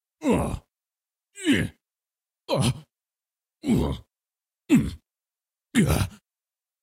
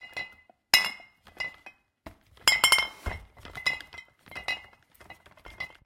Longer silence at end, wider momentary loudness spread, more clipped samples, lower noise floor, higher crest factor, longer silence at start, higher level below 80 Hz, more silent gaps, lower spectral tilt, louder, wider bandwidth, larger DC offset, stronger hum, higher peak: first, 0.7 s vs 0.2 s; second, 12 LU vs 22 LU; neither; first, under -90 dBFS vs -55 dBFS; second, 20 dB vs 28 dB; first, 0.2 s vs 0 s; first, -42 dBFS vs -52 dBFS; neither; first, -5.5 dB/octave vs 0.5 dB/octave; about the same, -25 LUFS vs -26 LUFS; about the same, 16 kHz vs 16.5 kHz; neither; neither; second, -6 dBFS vs -2 dBFS